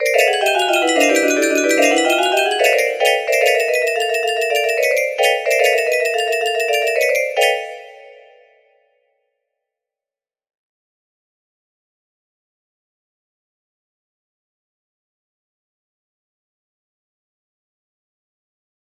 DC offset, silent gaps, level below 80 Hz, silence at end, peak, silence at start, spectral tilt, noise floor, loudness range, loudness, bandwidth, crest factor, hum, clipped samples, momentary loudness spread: under 0.1%; none; -72 dBFS; 10.75 s; -2 dBFS; 0 s; 0 dB/octave; under -90 dBFS; 7 LU; -15 LUFS; 15.5 kHz; 18 dB; none; under 0.1%; 4 LU